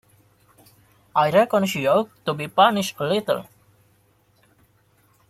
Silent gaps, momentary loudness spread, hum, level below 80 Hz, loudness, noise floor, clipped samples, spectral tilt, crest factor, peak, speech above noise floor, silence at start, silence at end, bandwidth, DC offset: none; 9 LU; none; -66 dBFS; -21 LUFS; -61 dBFS; under 0.1%; -5 dB/octave; 22 dB; -2 dBFS; 41 dB; 1.15 s; 1.85 s; 15.5 kHz; under 0.1%